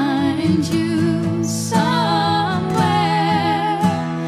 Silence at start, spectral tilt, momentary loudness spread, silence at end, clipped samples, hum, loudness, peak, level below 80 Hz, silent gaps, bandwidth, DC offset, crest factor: 0 s; -5.5 dB/octave; 3 LU; 0 s; under 0.1%; none; -18 LUFS; -4 dBFS; -50 dBFS; none; 15 kHz; under 0.1%; 14 dB